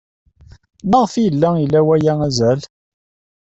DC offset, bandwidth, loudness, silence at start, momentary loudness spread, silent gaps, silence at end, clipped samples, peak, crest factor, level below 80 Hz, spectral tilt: under 0.1%; 8.2 kHz; -15 LUFS; 0.85 s; 4 LU; none; 0.8 s; under 0.1%; -2 dBFS; 16 dB; -48 dBFS; -7 dB/octave